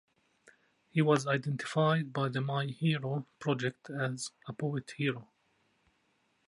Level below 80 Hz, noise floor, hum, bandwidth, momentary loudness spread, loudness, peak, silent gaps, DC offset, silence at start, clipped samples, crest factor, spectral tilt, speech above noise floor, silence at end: -78 dBFS; -74 dBFS; none; 11.5 kHz; 9 LU; -33 LUFS; -12 dBFS; none; under 0.1%; 0.95 s; under 0.1%; 22 dB; -6 dB/octave; 42 dB; 1.25 s